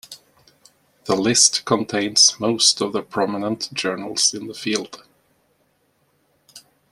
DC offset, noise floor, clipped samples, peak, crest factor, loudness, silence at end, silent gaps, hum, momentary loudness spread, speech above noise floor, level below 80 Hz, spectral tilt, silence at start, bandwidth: under 0.1%; -65 dBFS; under 0.1%; -2 dBFS; 22 dB; -18 LUFS; 0.3 s; none; none; 11 LU; 45 dB; -64 dBFS; -2 dB/octave; 0.1 s; 15.5 kHz